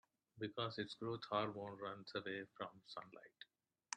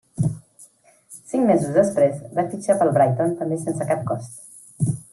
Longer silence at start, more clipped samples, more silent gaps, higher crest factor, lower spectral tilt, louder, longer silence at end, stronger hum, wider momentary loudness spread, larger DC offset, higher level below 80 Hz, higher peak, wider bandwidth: first, 0.35 s vs 0.15 s; neither; neither; first, 24 dB vs 18 dB; second, -4.5 dB/octave vs -7.5 dB/octave; second, -47 LUFS vs -21 LUFS; about the same, 0 s vs 0.1 s; neither; about the same, 18 LU vs 19 LU; neither; second, -86 dBFS vs -58 dBFS; second, -24 dBFS vs -4 dBFS; second, 10 kHz vs 12.5 kHz